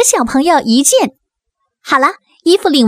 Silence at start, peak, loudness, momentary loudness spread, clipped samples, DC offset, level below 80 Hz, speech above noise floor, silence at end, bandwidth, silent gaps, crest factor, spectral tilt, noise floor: 0 s; 0 dBFS; -12 LUFS; 6 LU; under 0.1%; under 0.1%; -48 dBFS; 60 dB; 0 s; 16.5 kHz; none; 12 dB; -2 dB/octave; -71 dBFS